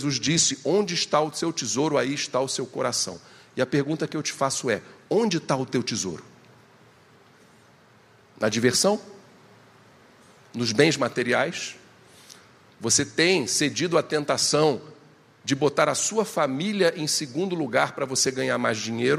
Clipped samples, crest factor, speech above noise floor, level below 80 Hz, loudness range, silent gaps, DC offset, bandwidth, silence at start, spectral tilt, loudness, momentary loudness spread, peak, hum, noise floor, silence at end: under 0.1%; 22 dB; 31 dB; -68 dBFS; 5 LU; none; under 0.1%; 15 kHz; 0 s; -3 dB/octave; -24 LUFS; 9 LU; -4 dBFS; none; -55 dBFS; 0 s